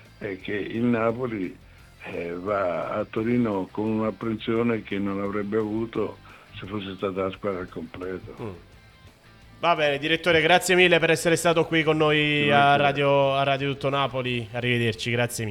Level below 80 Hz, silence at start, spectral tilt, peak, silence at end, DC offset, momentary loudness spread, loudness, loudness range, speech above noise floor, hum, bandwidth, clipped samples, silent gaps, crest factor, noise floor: -54 dBFS; 0.2 s; -5 dB/octave; -4 dBFS; 0 s; under 0.1%; 16 LU; -23 LUFS; 11 LU; 27 dB; none; 18.5 kHz; under 0.1%; none; 20 dB; -51 dBFS